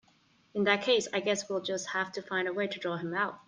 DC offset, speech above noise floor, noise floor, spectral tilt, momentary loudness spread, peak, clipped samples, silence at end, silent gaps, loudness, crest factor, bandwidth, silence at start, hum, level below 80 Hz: under 0.1%; 35 dB; -66 dBFS; -3.5 dB/octave; 7 LU; -12 dBFS; under 0.1%; 0.05 s; none; -31 LUFS; 20 dB; 10 kHz; 0.55 s; none; -78 dBFS